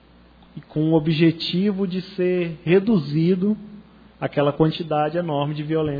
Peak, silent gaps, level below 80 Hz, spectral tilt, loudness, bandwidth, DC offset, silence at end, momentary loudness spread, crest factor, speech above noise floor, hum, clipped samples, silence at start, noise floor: -4 dBFS; none; -54 dBFS; -9.5 dB/octave; -21 LUFS; 5 kHz; under 0.1%; 0 s; 7 LU; 16 dB; 30 dB; none; under 0.1%; 0.55 s; -50 dBFS